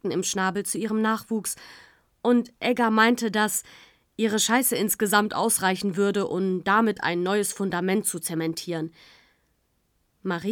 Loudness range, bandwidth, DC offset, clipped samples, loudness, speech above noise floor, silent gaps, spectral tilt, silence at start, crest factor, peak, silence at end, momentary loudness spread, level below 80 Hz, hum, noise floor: 4 LU; 19.5 kHz; under 0.1%; under 0.1%; -24 LUFS; 46 dB; none; -3.5 dB/octave; 0.05 s; 20 dB; -6 dBFS; 0 s; 9 LU; -68 dBFS; none; -70 dBFS